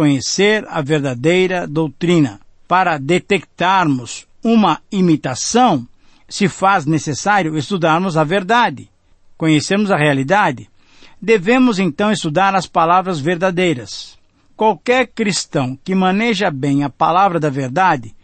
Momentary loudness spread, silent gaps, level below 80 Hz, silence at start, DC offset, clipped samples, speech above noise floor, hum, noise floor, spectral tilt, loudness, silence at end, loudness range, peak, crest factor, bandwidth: 6 LU; none; -52 dBFS; 0 s; under 0.1%; under 0.1%; 29 dB; none; -44 dBFS; -5 dB/octave; -15 LUFS; 0.1 s; 2 LU; -2 dBFS; 14 dB; 8.8 kHz